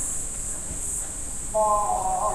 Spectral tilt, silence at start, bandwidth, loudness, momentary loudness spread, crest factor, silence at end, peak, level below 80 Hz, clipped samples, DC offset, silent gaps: -3 dB/octave; 0 s; 16 kHz; -26 LUFS; 7 LU; 14 dB; 0 s; -12 dBFS; -38 dBFS; under 0.1%; under 0.1%; none